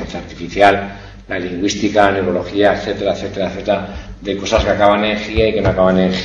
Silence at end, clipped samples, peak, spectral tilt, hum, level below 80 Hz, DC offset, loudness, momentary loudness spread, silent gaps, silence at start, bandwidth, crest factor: 0 s; under 0.1%; 0 dBFS; -5.5 dB/octave; none; -32 dBFS; under 0.1%; -16 LUFS; 13 LU; none; 0 s; 9.8 kHz; 16 dB